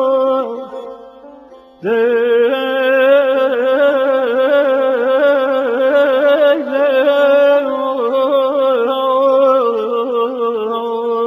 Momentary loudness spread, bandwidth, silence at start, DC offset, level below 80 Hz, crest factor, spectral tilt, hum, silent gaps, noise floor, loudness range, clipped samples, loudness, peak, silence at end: 7 LU; 13.5 kHz; 0 s; under 0.1%; -64 dBFS; 12 dB; -5.5 dB/octave; none; none; -40 dBFS; 2 LU; under 0.1%; -13 LUFS; -2 dBFS; 0 s